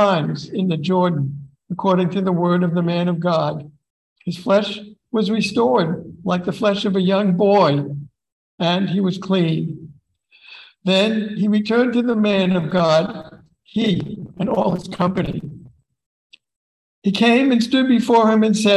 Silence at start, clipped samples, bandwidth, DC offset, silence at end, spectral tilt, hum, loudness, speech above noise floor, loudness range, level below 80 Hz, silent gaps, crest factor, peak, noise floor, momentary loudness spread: 0 s; under 0.1%; 12 kHz; under 0.1%; 0 s; -6.5 dB/octave; none; -18 LUFS; 37 dB; 4 LU; -54 dBFS; 3.90-4.16 s, 8.33-8.58 s, 16.06-16.30 s, 16.56-17.02 s; 16 dB; -2 dBFS; -55 dBFS; 13 LU